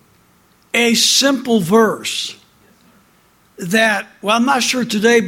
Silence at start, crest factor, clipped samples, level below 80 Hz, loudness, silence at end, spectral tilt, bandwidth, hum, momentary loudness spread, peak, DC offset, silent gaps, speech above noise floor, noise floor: 0.75 s; 16 dB; under 0.1%; -60 dBFS; -14 LUFS; 0 s; -2.5 dB/octave; 17 kHz; none; 10 LU; 0 dBFS; under 0.1%; none; 39 dB; -54 dBFS